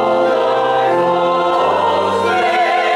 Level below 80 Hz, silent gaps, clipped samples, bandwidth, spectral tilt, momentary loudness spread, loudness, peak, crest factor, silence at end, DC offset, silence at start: -58 dBFS; none; under 0.1%; 12 kHz; -5 dB/octave; 1 LU; -14 LUFS; -4 dBFS; 10 dB; 0 s; under 0.1%; 0 s